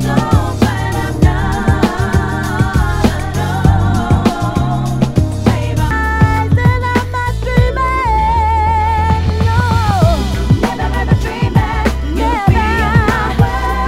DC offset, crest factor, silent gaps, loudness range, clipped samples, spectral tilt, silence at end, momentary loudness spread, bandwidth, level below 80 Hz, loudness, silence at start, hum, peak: under 0.1%; 12 dB; none; 1 LU; 0.3%; -6.5 dB/octave; 0 s; 4 LU; 15.5 kHz; -20 dBFS; -14 LUFS; 0 s; none; 0 dBFS